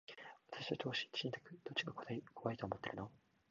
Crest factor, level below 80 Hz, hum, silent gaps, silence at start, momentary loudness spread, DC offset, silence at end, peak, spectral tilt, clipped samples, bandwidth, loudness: 24 dB; -74 dBFS; none; none; 0.1 s; 12 LU; under 0.1%; 0.35 s; -24 dBFS; -3 dB/octave; under 0.1%; 7.2 kHz; -45 LUFS